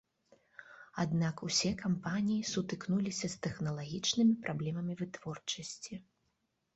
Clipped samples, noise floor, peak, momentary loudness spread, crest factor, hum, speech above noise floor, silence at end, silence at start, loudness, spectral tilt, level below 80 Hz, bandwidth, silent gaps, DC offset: under 0.1%; -81 dBFS; -18 dBFS; 14 LU; 18 dB; none; 46 dB; 0.75 s; 0.6 s; -35 LUFS; -4.5 dB/octave; -66 dBFS; 8.2 kHz; none; under 0.1%